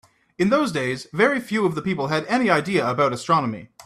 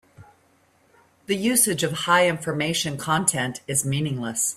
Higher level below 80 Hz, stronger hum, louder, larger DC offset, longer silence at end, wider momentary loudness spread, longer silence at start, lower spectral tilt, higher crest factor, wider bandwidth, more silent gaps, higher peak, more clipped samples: about the same, -60 dBFS vs -60 dBFS; neither; about the same, -21 LUFS vs -22 LUFS; neither; about the same, 0.05 s vs 0 s; about the same, 6 LU vs 7 LU; first, 0.4 s vs 0.2 s; first, -5.5 dB/octave vs -3 dB/octave; about the same, 18 dB vs 20 dB; second, 14 kHz vs 16 kHz; neither; about the same, -4 dBFS vs -4 dBFS; neither